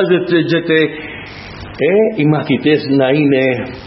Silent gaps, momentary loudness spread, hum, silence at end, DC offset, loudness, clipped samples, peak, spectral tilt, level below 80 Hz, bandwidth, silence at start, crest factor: none; 16 LU; none; 0 s; under 0.1%; -13 LUFS; under 0.1%; 0 dBFS; -9 dB/octave; -46 dBFS; 6 kHz; 0 s; 14 dB